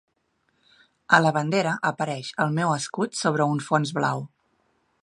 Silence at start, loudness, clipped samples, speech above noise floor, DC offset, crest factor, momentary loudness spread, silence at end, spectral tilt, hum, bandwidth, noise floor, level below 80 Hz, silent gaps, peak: 1.1 s; -24 LUFS; under 0.1%; 48 dB; under 0.1%; 24 dB; 9 LU; 0.75 s; -5 dB/octave; none; 11.5 kHz; -71 dBFS; -72 dBFS; none; -2 dBFS